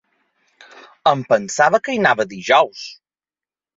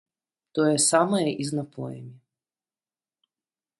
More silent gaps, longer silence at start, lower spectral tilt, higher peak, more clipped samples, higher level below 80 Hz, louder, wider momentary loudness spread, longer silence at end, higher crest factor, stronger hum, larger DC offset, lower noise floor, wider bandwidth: neither; first, 1.05 s vs 0.55 s; about the same, -3.5 dB/octave vs -4 dB/octave; first, 0 dBFS vs -6 dBFS; neither; first, -64 dBFS vs -72 dBFS; first, -17 LUFS vs -23 LUFS; second, 7 LU vs 17 LU; second, 0.85 s vs 1.65 s; about the same, 18 dB vs 22 dB; first, 50 Hz at -60 dBFS vs none; neither; about the same, under -90 dBFS vs under -90 dBFS; second, 7.8 kHz vs 12 kHz